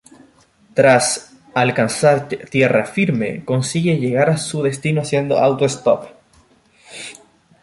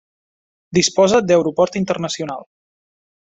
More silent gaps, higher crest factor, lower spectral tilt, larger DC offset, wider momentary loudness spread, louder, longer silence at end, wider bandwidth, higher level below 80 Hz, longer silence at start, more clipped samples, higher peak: neither; about the same, 16 dB vs 18 dB; about the same, -5 dB/octave vs -4.5 dB/octave; neither; second, 9 LU vs 12 LU; about the same, -17 LUFS vs -17 LUFS; second, 0.5 s vs 0.95 s; first, 11.5 kHz vs 8.2 kHz; about the same, -56 dBFS vs -56 dBFS; about the same, 0.75 s vs 0.7 s; neither; about the same, -2 dBFS vs -2 dBFS